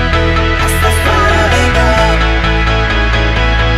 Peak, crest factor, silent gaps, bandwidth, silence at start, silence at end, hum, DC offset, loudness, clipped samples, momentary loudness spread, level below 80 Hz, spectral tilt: 0 dBFS; 10 dB; none; 15 kHz; 0 s; 0 s; none; under 0.1%; -11 LUFS; under 0.1%; 2 LU; -14 dBFS; -5 dB/octave